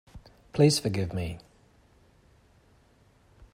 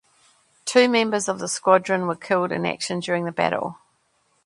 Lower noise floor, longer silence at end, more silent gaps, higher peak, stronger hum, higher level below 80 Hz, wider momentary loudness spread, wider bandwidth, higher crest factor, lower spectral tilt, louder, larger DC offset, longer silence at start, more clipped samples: second, -62 dBFS vs -66 dBFS; first, 2.15 s vs 0.7 s; neither; second, -10 dBFS vs -2 dBFS; neither; first, -56 dBFS vs -68 dBFS; first, 15 LU vs 8 LU; first, 16 kHz vs 11.5 kHz; about the same, 22 dB vs 22 dB; first, -5.5 dB/octave vs -4 dB/octave; second, -27 LUFS vs -22 LUFS; neither; second, 0.15 s vs 0.65 s; neither